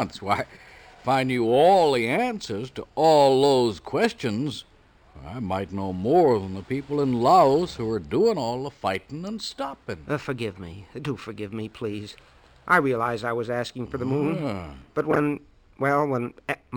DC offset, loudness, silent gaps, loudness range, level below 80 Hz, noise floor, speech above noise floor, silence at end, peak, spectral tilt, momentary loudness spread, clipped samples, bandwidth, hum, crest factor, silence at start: under 0.1%; -24 LUFS; none; 10 LU; -54 dBFS; -52 dBFS; 28 dB; 0 s; -6 dBFS; -6 dB/octave; 16 LU; under 0.1%; over 20 kHz; none; 18 dB; 0 s